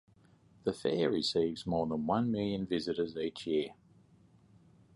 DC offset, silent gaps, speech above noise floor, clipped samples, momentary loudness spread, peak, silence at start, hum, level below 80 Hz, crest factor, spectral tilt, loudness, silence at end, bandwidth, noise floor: under 0.1%; none; 31 dB; under 0.1%; 7 LU; -18 dBFS; 0.65 s; none; -64 dBFS; 18 dB; -6 dB/octave; -34 LUFS; 1.2 s; 11.5 kHz; -64 dBFS